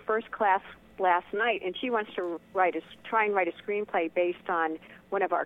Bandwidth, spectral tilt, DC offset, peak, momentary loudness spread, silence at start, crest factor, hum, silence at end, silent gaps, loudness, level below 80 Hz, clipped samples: 4 kHz; -6.5 dB/octave; under 0.1%; -10 dBFS; 8 LU; 0.05 s; 18 dB; none; 0 s; none; -29 LUFS; -70 dBFS; under 0.1%